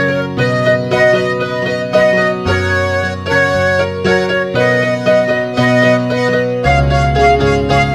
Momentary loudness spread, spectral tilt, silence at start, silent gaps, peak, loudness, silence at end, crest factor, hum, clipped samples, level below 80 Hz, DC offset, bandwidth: 4 LU; -6 dB/octave; 0 s; none; 0 dBFS; -13 LUFS; 0 s; 12 dB; none; under 0.1%; -28 dBFS; 0.2%; 13.5 kHz